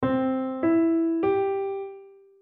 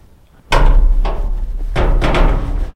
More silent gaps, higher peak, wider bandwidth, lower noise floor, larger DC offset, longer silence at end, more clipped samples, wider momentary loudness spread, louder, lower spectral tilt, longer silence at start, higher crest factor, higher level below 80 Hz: neither; second, -14 dBFS vs 0 dBFS; second, 3.8 kHz vs 8.4 kHz; about the same, -47 dBFS vs -44 dBFS; neither; first, 0.3 s vs 0.05 s; neither; about the same, 10 LU vs 9 LU; second, -25 LUFS vs -18 LUFS; first, -10.5 dB/octave vs -6 dB/octave; second, 0 s vs 0.5 s; about the same, 12 dB vs 12 dB; second, -64 dBFS vs -14 dBFS